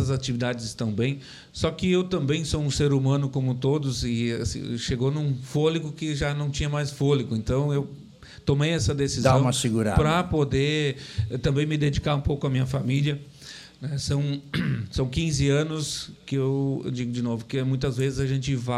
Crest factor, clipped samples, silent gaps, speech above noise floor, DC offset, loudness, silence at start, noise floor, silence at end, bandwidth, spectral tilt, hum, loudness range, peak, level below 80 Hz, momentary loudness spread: 20 dB; under 0.1%; none; 20 dB; under 0.1%; -25 LUFS; 0 s; -45 dBFS; 0 s; 12.5 kHz; -6 dB/octave; none; 3 LU; -6 dBFS; -42 dBFS; 7 LU